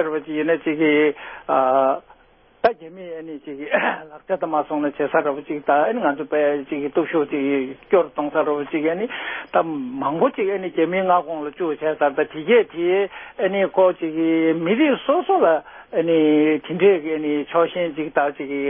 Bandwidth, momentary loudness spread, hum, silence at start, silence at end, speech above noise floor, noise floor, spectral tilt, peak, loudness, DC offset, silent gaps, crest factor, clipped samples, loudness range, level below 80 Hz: 5.6 kHz; 9 LU; none; 0 s; 0 s; 34 dB; -54 dBFS; -10.5 dB/octave; -4 dBFS; -20 LUFS; under 0.1%; none; 18 dB; under 0.1%; 4 LU; -62 dBFS